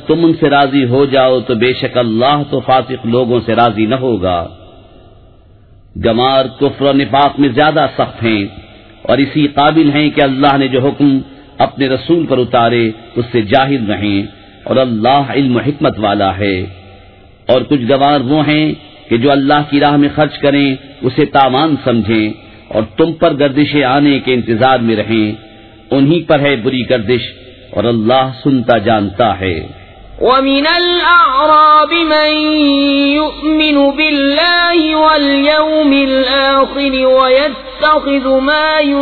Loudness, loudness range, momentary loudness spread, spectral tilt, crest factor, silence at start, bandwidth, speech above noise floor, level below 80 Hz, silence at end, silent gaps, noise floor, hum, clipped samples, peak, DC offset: -11 LUFS; 4 LU; 7 LU; -8.5 dB/octave; 12 dB; 0 s; 4.6 kHz; 31 dB; -40 dBFS; 0 s; none; -41 dBFS; none; under 0.1%; 0 dBFS; under 0.1%